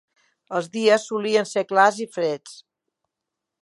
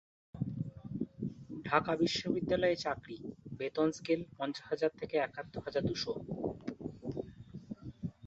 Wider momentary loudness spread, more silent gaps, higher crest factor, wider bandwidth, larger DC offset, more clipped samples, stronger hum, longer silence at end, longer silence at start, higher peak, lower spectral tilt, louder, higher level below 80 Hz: second, 10 LU vs 15 LU; neither; about the same, 22 dB vs 26 dB; first, 11.5 kHz vs 8 kHz; neither; neither; neither; first, 1.1 s vs 0 s; first, 0.5 s vs 0.35 s; first, -2 dBFS vs -12 dBFS; about the same, -3.5 dB/octave vs -4.5 dB/octave; first, -21 LUFS vs -36 LUFS; second, -80 dBFS vs -62 dBFS